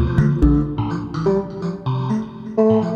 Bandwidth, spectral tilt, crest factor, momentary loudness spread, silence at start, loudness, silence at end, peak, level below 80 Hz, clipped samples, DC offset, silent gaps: 7.4 kHz; -9.5 dB/octave; 16 dB; 9 LU; 0 s; -20 LUFS; 0 s; -2 dBFS; -28 dBFS; under 0.1%; under 0.1%; none